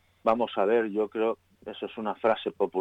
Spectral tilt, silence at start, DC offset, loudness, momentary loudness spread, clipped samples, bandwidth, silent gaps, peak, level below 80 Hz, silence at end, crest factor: -7 dB/octave; 0.25 s; under 0.1%; -28 LUFS; 13 LU; under 0.1%; 7.2 kHz; none; -12 dBFS; -68 dBFS; 0 s; 16 dB